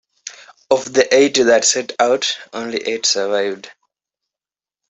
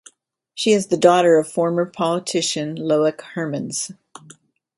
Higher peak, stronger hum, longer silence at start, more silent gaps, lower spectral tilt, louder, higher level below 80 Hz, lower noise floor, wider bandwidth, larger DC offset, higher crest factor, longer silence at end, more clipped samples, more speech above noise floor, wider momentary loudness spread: about the same, 0 dBFS vs 0 dBFS; neither; second, 0.25 s vs 0.55 s; neither; second, -1.5 dB/octave vs -4.5 dB/octave; first, -16 LUFS vs -19 LUFS; about the same, -64 dBFS vs -68 dBFS; first, under -90 dBFS vs -58 dBFS; second, 8.4 kHz vs 11.5 kHz; neither; about the same, 18 dB vs 20 dB; first, 1.2 s vs 0.85 s; neither; first, over 74 dB vs 39 dB; first, 17 LU vs 12 LU